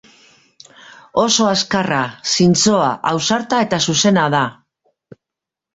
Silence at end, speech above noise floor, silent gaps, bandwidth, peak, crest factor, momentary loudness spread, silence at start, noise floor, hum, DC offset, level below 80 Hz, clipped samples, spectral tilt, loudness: 1.25 s; 69 dB; none; 8 kHz; -2 dBFS; 16 dB; 6 LU; 1.15 s; -85 dBFS; none; under 0.1%; -54 dBFS; under 0.1%; -3.5 dB/octave; -15 LUFS